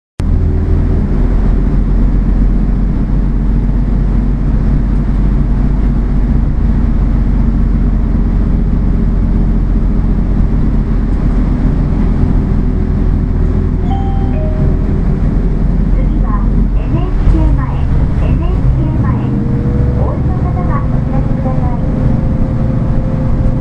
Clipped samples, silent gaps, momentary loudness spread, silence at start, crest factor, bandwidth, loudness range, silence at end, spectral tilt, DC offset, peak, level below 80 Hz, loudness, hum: under 0.1%; none; 2 LU; 0.2 s; 10 dB; 3.6 kHz; 1 LU; 0 s; -10.5 dB/octave; under 0.1%; 0 dBFS; -12 dBFS; -14 LUFS; none